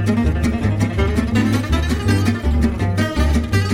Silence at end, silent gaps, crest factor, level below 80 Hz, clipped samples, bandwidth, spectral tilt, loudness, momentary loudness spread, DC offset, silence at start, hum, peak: 0 s; none; 14 dB; -22 dBFS; under 0.1%; 15.5 kHz; -6.5 dB/octave; -18 LUFS; 2 LU; under 0.1%; 0 s; none; -4 dBFS